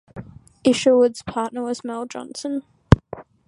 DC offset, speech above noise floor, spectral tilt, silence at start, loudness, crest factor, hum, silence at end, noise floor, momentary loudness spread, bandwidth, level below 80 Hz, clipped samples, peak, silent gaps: under 0.1%; 18 dB; -6.5 dB/octave; 0.15 s; -21 LUFS; 22 dB; none; 0.25 s; -39 dBFS; 16 LU; 11.5 kHz; -38 dBFS; under 0.1%; 0 dBFS; none